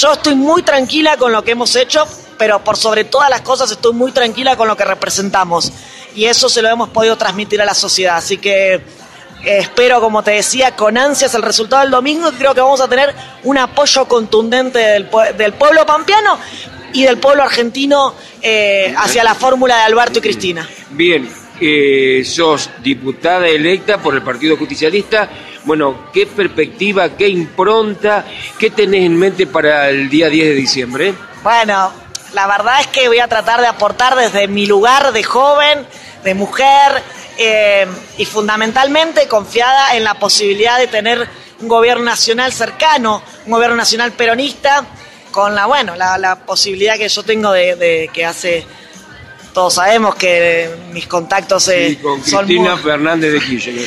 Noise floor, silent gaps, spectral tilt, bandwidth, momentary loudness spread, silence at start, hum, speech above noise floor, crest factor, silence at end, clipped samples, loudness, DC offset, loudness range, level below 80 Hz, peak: -35 dBFS; none; -2.5 dB/octave; 12.5 kHz; 7 LU; 0 s; none; 23 dB; 12 dB; 0 s; under 0.1%; -11 LUFS; under 0.1%; 3 LU; -50 dBFS; 0 dBFS